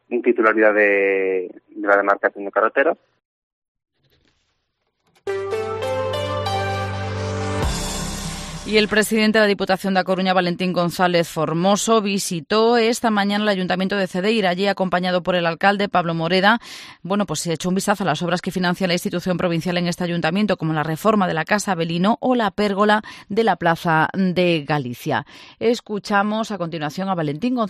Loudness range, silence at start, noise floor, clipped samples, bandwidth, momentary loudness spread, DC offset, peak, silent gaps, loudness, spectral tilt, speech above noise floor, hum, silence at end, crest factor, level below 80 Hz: 6 LU; 0.1 s; -72 dBFS; under 0.1%; 15 kHz; 9 LU; under 0.1%; -2 dBFS; 3.25-3.62 s, 3.68-3.75 s; -20 LUFS; -5 dB/octave; 53 dB; none; 0 s; 18 dB; -44 dBFS